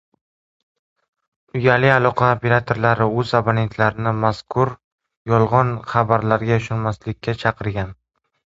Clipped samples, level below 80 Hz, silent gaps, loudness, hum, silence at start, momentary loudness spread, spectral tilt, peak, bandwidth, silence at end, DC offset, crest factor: under 0.1%; -46 dBFS; 4.84-4.98 s, 5.17-5.25 s; -19 LUFS; none; 1.55 s; 10 LU; -7.5 dB/octave; 0 dBFS; 7.8 kHz; 0.55 s; under 0.1%; 20 dB